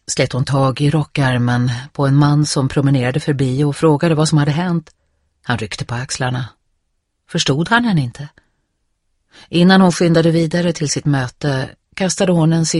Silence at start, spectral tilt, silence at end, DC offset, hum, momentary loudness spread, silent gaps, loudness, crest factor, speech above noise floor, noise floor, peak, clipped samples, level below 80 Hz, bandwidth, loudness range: 0.1 s; -5.5 dB/octave; 0 s; under 0.1%; none; 10 LU; none; -16 LUFS; 16 dB; 53 dB; -69 dBFS; 0 dBFS; under 0.1%; -46 dBFS; 11.5 kHz; 5 LU